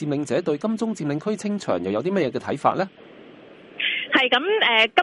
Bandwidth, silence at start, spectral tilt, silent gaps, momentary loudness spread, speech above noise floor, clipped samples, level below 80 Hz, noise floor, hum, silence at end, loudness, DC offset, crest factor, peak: 11.5 kHz; 0 s; -4.5 dB/octave; none; 9 LU; 23 dB; under 0.1%; -66 dBFS; -45 dBFS; none; 0 s; -22 LUFS; under 0.1%; 20 dB; -2 dBFS